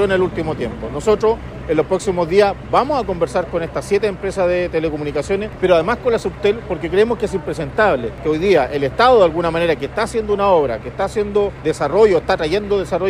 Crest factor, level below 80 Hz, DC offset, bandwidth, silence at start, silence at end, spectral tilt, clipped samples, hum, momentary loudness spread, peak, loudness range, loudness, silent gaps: 16 dB; -36 dBFS; under 0.1%; 13 kHz; 0 s; 0 s; -6 dB/octave; under 0.1%; none; 8 LU; 0 dBFS; 2 LU; -17 LUFS; none